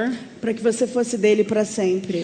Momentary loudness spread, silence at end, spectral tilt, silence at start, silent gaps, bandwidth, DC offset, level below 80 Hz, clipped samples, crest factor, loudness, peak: 8 LU; 0 s; -5 dB/octave; 0 s; none; 9.4 kHz; under 0.1%; -64 dBFS; under 0.1%; 16 dB; -21 LUFS; -6 dBFS